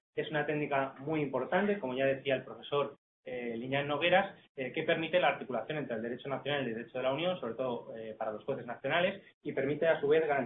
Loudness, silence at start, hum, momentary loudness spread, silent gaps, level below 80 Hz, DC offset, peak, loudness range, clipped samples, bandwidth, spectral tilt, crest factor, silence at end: -33 LUFS; 0.15 s; none; 11 LU; 2.98-3.23 s, 4.49-4.55 s, 9.34-9.41 s; -74 dBFS; under 0.1%; -14 dBFS; 3 LU; under 0.1%; 4 kHz; -9 dB/octave; 20 dB; 0 s